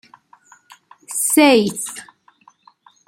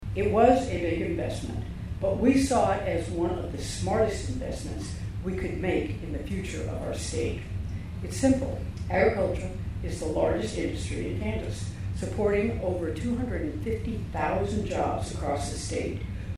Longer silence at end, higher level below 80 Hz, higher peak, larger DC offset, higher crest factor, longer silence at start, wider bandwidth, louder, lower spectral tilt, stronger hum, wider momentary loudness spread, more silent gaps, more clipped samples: first, 1.05 s vs 0 s; second, -66 dBFS vs -40 dBFS; first, -2 dBFS vs -8 dBFS; neither; about the same, 18 dB vs 20 dB; first, 1.1 s vs 0 s; about the same, 16.5 kHz vs 15 kHz; first, -16 LUFS vs -29 LUFS; second, -2.5 dB/octave vs -6 dB/octave; neither; first, 17 LU vs 11 LU; neither; neither